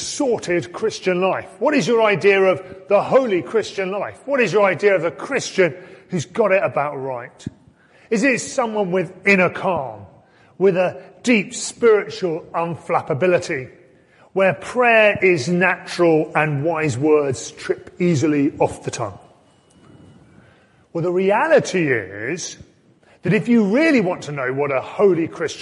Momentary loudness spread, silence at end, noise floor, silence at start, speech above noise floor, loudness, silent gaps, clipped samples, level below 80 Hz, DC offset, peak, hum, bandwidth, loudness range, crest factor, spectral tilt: 12 LU; 0 s; -53 dBFS; 0 s; 35 dB; -19 LUFS; none; under 0.1%; -58 dBFS; under 0.1%; -2 dBFS; none; 11.5 kHz; 4 LU; 18 dB; -5.5 dB/octave